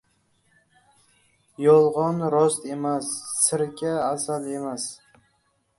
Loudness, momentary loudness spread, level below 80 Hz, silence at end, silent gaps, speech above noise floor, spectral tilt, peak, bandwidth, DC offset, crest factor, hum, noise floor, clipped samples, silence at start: -23 LUFS; 12 LU; -68 dBFS; 0.85 s; none; 46 dB; -4.5 dB/octave; -4 dBFS; 12 kHz; under 0.1%; 20 dB; none; -69 dBFS; under 0.1%; 1.6 s